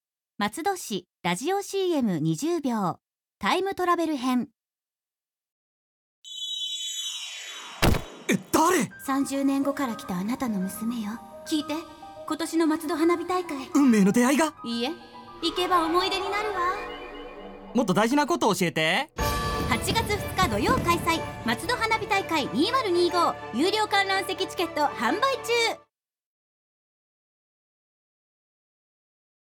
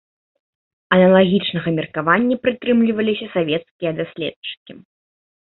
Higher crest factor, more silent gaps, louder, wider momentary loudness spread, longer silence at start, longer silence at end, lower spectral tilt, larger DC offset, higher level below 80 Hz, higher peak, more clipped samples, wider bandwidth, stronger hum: about the same, 18 dB vs 18 dB; first, 5.51-6.23 s vs 3.71-3.79 s, 4.36-4.42 s, 4.57-4.66 s; second, -26 LUFS vs -18 LUFS; second, 11 LU vs 14 LU; second, 0.4 s vs 0.9 s; first, 3.65 s vs 0.7 s; second, -4.5 dB/octave vs -11 dB/octave; neither; first, -46 dBFS vs -56 dBFS; second, -8 dBFS vs -2 dBFS; neither; first, 19 kHz vs 4.2 kHz; neither